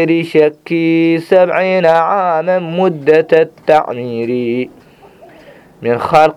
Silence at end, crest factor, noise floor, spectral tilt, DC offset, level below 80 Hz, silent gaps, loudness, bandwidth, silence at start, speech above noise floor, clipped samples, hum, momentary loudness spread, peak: 0.05 s; 12 dB; -41 dBFS; -7 dB/octave; under 0.1%; -54 dBFS; none; -13 LUFS; 12 kHz; 0 s; 29 dB; 0.2%; none; 8 LU; 0 dBFS